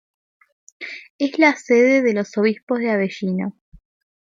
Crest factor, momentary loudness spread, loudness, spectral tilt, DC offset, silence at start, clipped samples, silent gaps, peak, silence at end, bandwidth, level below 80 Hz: 18 dB; 18 LU; -18 LUFS; -6 dB/octave; under 0.1%; 0.8 s; under 0.1%; 1.10-1.19 s, 2.63-2.67 s; -2 dBFS; 0.85 s; 7.6 kHz; -60 dBFS